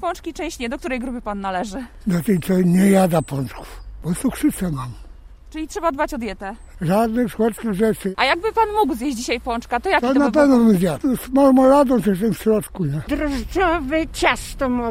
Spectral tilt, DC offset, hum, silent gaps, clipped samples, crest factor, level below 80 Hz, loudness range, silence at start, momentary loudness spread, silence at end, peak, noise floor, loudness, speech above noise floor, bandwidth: -6 dB/octave; under 0.1%; none; none; under 0.1%; 18 dB; -38 dBFS; 7 LU; 0 s; 13 LU; 0 s; -2 dBFS; -40 dBFS; -19 LUFS; 21 dB; 16 kHz